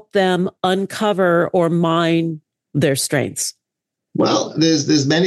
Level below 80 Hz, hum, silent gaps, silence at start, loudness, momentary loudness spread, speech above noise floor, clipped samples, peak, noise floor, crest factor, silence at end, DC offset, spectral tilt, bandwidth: -64 dBFS; none; none; 0.15 s; -18 LUFS; 9 LU; 65 dB; under 0.1%; -4 dBFS; -82 dBFS; 14 dB; 0 s; under 0.1%; -4.5 dB/octave; 12.5 kHz